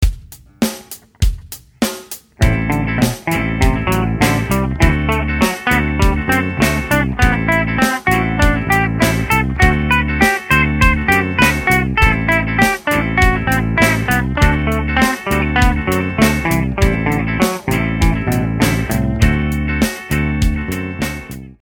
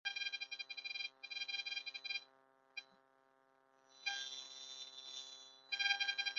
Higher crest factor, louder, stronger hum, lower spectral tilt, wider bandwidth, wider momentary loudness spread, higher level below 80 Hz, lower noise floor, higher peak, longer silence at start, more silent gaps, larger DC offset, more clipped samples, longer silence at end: second, 16 dB vs 26 dB; first, -15 LUFS vs -43 LUFS; neither; first, -5.5 dB/octave vs 6.5 dB/octave; first, 18.5 kHz vs 7.6 kHz; second, 8 LU vs 17 LU; first, -22 dBFS vs under -90 dBFS; second, -36 dBFS vs -74 dBFS; first, 0 dBFS vs -20 dBFS; about the same, 0 s vs 0.05 s; neither; neither; neither; about the same, 0.1 s vs 0 s